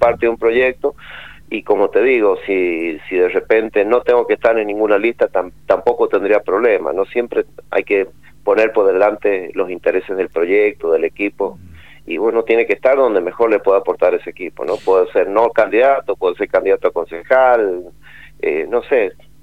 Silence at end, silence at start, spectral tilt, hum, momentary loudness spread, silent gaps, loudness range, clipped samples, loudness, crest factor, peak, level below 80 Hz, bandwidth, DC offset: 0.3 s; 0 s; -6.5 dB/octave; none; 9 LU; none; 2 LU; under 0.1%; -16 LUFS; 16 dB; 0 dBFS; -50 dBFS; 5.8 kHz; 0.8%